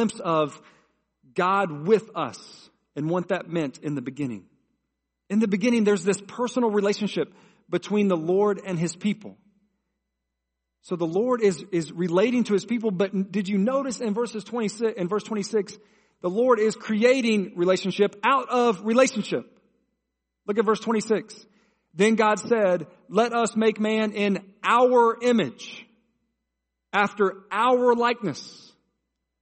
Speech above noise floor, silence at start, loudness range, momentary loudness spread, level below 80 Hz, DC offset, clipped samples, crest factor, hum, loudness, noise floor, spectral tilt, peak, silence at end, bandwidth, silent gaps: 58 dB; 0 s; 5 LU; 11 LU; -72 dBFS; under 0.1%; under 0.1%; 18 dB; none; -24 LUFS; -82 dBFS; -5.5 dB/octave; -6 dBFS; 0.85 s; 8.8 kHz; none